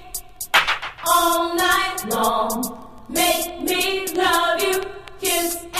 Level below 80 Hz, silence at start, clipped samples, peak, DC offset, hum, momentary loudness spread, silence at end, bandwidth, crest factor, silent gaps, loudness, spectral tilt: -48 dBFS; 0 s; under 0.1%; -2 dBFS; under 0.1%; none; 9 LU; 0 s; 15.5 kHz; 20 dB; none; -20 LUFS; -1.5 dB/octave